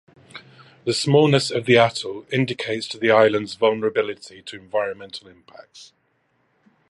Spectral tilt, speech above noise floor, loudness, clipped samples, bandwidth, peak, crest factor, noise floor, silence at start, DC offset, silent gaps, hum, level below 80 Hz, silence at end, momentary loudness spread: -5 dB/octave; 46 dB; -20 LUFS; under 0.1%; 11.5 kHz; 0 dBFS; 22 dB; -67 dBFS; 0.35 s; under 0.1%; none; none; -64 dBFS; 1.05 s; 21 LU